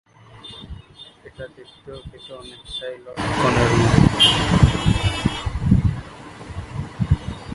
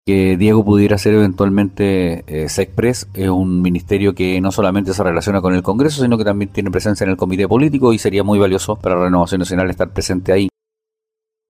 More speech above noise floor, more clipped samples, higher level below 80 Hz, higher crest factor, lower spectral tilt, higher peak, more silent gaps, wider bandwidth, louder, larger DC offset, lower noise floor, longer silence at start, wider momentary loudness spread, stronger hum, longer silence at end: second, 25 dB vs 69 dB; neither; first, -30 dBFS vs -40 dBFS; first, 20 dB vs 14 dB; about the same, -5.5 dB/octave vs -6.5 dB/octave; about the same, 0 dBFS vs 0 dBFS; neither; second, 11.5 kHz vs 16 kHz; second, -18 LUFS vs -15 LUFS; neither; second, -44 dBFS vs -83 dBFS; first, 0.45 s vs 0.05 s; first, 24 LU vs 6 LU; neither; second, 0 s vs 1 s